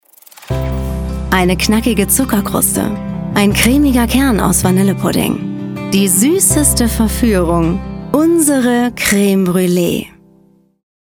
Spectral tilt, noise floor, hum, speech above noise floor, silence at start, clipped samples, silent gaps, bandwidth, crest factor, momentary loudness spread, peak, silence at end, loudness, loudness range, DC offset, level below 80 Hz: -4.5 dB/octave; -50 dBFS; none; 38 dB; 0.4 s; under 0.1%; none; over 20 kHz; 14 dB; 10 LU; 0 dBFS; 1.05 s; -13 LUFS; 2 LU; under 0.1%; -26 dBFS